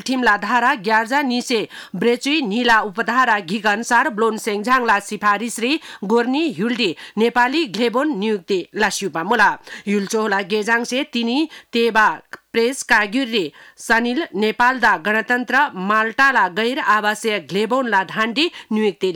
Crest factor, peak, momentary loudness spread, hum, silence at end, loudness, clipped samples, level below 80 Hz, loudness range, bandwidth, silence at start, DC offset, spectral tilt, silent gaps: 12 dB; -6 dBFS; 6 LU; none; 0 s; -18 LUFS; under 0.1%; -56 dBFS; 2 LU; 18.5 kHz; 0 s; under 0.1%; -3.5 dB/octave; none